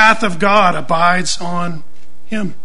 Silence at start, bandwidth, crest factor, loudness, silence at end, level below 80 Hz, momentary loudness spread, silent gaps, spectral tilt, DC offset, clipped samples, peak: 0 s; 11 kHz; 16 dB; -15 LUFS; 0.1 s; -46 dBFS; 14 LU; none; -4 dB/octave; 10%; 0.1%; 0 dBFS